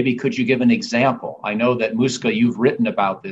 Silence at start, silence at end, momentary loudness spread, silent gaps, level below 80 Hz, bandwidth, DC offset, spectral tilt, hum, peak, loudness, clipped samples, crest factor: 0 s; 0 s; 4 LU; none; -60 dBFS; 8 kHz; under 0.1%; -5.5 dB/octave; none; -4 dBFS; -19 LUFS; under 0.1%; 14 dB